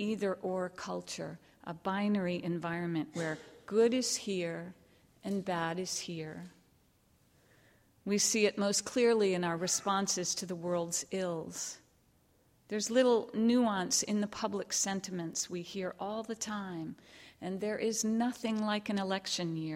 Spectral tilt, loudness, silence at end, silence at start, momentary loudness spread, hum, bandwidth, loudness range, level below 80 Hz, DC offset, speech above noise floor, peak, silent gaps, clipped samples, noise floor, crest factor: -3.5 dB/octave; -33 LUFS; 0 s; 0 s; 13 LU; none; 16.5 kHz; 6 LU; -74 dBFS; under 0.1%; 35 dB; -16 dBFS; none; under 0.1%; -69 dBFS; 20 dB